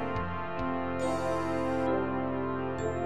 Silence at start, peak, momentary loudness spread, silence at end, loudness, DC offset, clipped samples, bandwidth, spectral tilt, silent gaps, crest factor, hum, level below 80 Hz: 0 s; -18 dBFS; 4 LU; 0 s; -32 LUFS; 0.8%; under 0.1%; 12.5 kHz; -7 dB/octave; none; 14 dB; none; -52 dBFS